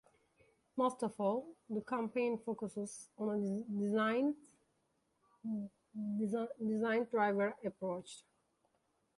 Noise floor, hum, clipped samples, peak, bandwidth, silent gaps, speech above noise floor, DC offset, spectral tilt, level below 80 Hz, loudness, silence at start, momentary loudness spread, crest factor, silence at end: -80 dBFS; none; under 0.1%; -22 dBFS; 11.5 kHz; none; 42 dB; under 0.1%; -6 dB/octave; -82 dBFS; -38 LUFS; 0.75 s; 12 LU; 18 dB; 0.95 s